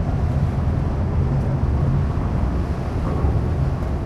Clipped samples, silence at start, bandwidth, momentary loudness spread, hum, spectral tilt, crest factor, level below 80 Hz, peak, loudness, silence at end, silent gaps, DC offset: under 0.1%; 0 s; 7.4 kHz; 3 LU; none; -9 dB/octave; 12 dB; -26 dBFS; -8 dBFS; -22 LUFS; 0 s; none; under 0.1%